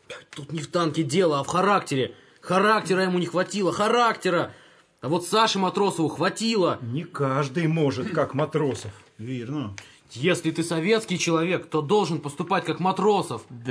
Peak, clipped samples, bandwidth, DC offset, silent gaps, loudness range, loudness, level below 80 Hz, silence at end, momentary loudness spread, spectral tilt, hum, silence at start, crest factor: -8 dBFS; under 0.1%; 11 kHz; under 0.1%; none; 4 LU; -24 LUFS; -68 dBFS; 0 s; 13 LU; -5 dB/octave; none; 0.1 s; 18 dB